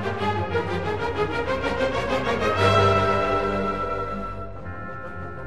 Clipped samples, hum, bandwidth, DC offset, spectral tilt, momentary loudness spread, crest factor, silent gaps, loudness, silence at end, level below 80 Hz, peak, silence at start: under 0.1%; none; 12 kHz; 1%; -6 dB/octave; 16 LU; 18 dB; none; -23 LUFS; 0 s; -42 dBFS; -6 dBFS; 0 s